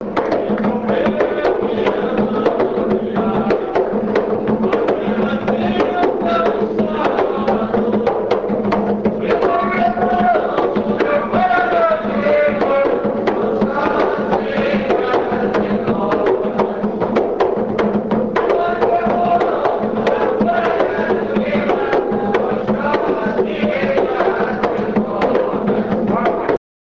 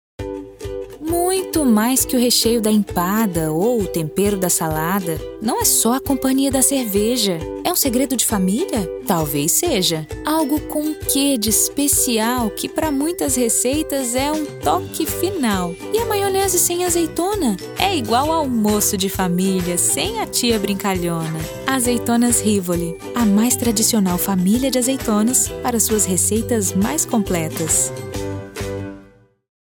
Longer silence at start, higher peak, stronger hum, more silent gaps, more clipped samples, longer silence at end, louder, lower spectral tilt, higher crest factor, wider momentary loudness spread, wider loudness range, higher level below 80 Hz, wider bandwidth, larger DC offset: second, 0 s vs 0.2 s; about the same, 0 dBFS vs 0 dBFS; neither; neither; neither; second, 0.3 s vs 0.65 s; about the same, -17 LUFS vs -18 LUFS; first, -8 dB/octave vs -3.5 dB/octave; about the same, 16 dB vs 18 dB; second, 3 LU vs 8 LU; about the same, 2 LU vs 2 LU; about the same, -44 dBFS vs -40 dBFS; second, 7 kHz vs over 20 kHz; first, 0.4% vs under 0.1%